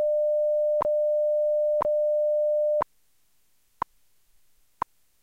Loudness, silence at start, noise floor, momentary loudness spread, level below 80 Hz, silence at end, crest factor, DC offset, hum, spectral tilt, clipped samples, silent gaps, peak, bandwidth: -25 LUFS; 0 s; -70 dBFS; 13 LU; -64 dBFS; 2.4 s; 12 dB; under 0.1%; none; -6.5 dB/octave; under 0.1%; none; -14 dBFS; 3.5 kHz